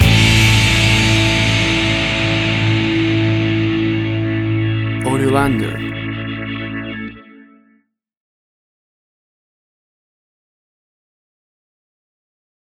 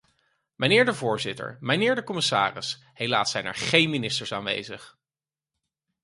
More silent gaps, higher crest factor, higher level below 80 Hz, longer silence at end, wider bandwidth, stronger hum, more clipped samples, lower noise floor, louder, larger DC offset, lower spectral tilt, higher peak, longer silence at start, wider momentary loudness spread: neither; second, 16 dB vs 24 dB; first, -32 dBFS vs -64 dBFS; first, 5.4 s vs 1.15 s; first, 15 kHz vs 11.5 kHz; neither; neither; second, -60 dBFS vs under -90 dBFS; first, -15 LUFS vs -24 LUFS; neither; first, -5 dB/octave vs -3.5 dB/octave; first, 0 dBFS vs -4 dBFS; second, 0 s vs 0.6 s; about the same, 13 LU vs 12 LU